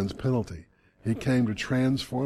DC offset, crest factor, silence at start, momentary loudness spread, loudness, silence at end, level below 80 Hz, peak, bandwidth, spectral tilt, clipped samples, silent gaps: under 0.1%; 14 dB; 0 s; 12 LU; -27 LUFS; 0 s; -52 dBFS; -14 dBFS; 13 kHz; -6.5 dB/octave; under 0.1%; none